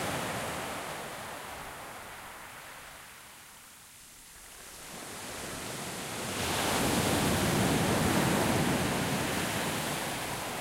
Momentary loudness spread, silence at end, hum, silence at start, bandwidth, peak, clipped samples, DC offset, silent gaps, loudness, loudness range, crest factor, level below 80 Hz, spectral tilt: 21 LU; 0 s; none; 0 s; 16 kHz; -14 dBFS; under 0.1%; under 0.1%; none; -31 LUFS; 17 LU; 18 dB; -52 dBFS; -4 dB/octave